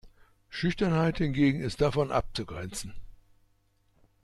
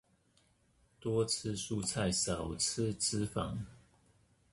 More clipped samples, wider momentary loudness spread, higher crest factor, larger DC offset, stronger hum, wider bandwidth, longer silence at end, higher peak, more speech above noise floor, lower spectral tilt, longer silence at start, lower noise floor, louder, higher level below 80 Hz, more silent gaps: neither; first, 13 LU vs 8 LU; about the same, 18 dB vs 18 dB; neither; neither; about the same, 12.5 kHz vs 12 kHz; first, 1.15 s vs 0.75 s; first, -14 dBFS vs -20 dBFS; first, 40 dB vs 36 dB; first, -6 dB/octave vs -4 dB/octave; second, 0.05 s vs 1 s; about the same, -68 dBFS vs -71 dBFS; first, -29 LUFS vs -35 LUFS; first, -46 dBFS vs -56 dBFS; neither